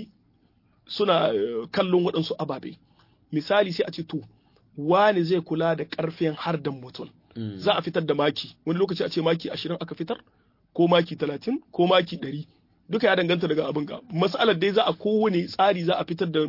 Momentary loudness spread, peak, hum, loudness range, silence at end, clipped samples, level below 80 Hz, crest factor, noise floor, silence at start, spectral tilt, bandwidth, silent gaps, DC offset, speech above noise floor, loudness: 13 LU; -6 dBFS; none; 3 LU; 0 s; under 0.1%; -68 dBFS; 18 dB; -63 dBFS; 0 s; -7 dB/octave; 5.8 kHz; none; under 0.1%; 39 dB; -25 LUFS